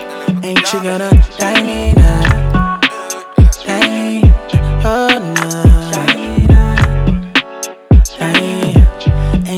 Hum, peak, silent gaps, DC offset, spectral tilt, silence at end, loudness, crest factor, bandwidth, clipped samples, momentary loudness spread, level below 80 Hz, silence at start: none; 0 dBFS; none; under 0.1%; -5.5 dB/octave; 0 s; -12 LUFS; 10 dB; 14 kHz; under 0.1%; 5 LU; -14 dBFS; 0 s